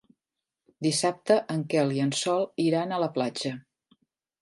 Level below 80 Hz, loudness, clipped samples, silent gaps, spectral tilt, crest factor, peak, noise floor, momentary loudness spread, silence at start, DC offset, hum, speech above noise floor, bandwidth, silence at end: -76 dBFS; -27 LUFS; under 0.1%; none; -5 dB/octave; 18 dB; -10 dBFS; -88 dBFS; 6 LU; 0.8 s; under 0.1%; none; 62 dB; 11.5 kHz; 0.8 s